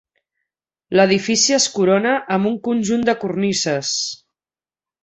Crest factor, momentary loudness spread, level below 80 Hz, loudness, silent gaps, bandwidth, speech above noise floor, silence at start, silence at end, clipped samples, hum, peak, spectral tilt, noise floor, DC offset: 18 dB; 6 LU; -60 dBFS; -17 LUFS; none; 8.4 kHz; over 73 dB; 0.9 s; 0.9 s; under 0.1%; none; -2 dBFS; -3.5 dB/octave; under -90 dBFS; under 0.1%